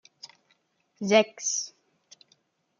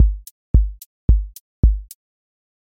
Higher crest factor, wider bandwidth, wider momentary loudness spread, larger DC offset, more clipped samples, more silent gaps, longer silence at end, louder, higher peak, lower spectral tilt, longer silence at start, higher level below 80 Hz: first, 24 dB vs 16 dB; second, 7.4 kHz vs 16 kHz; first, 25 LU vs 11 LU; neither; neither; second, none vs 0.31-0.54 s, 0.86-1.08 s, 1.40-1.63 s; first, 1.1 s vs 0.85 s; second, -25 LUFS vs -21 LUFS; second, -6 dBFS vs -2 dBFS; second, -2.5 dB/octave vs -8.5 dB/octave; first, 1 s vs 0 s; second, -82 dBFS vs -20 dBFS